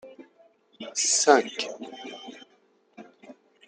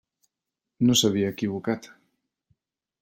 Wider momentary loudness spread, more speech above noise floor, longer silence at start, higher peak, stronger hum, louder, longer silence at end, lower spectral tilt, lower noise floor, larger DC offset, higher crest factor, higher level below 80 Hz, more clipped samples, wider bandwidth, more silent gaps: first, 23 LU vs 11 LU; second, 40 dB vs 63 dB; second, 0.05 s vs 0.8 s; first, -4 dBFS vs -8 dBFS; neither; about the same, -23 LUFS vs -24 LUFS; second, 0.35 s vs 1.15 s; second, 0 dB/octave vs -4.5 dB/octave; second, -64 dBFS vs -87 dBFS; neither; first, 26 dB vs 20 dB; second, -86 dBFS vs -62 dBFS; neither; second, 10 kHz vs 16.5 kHz; neither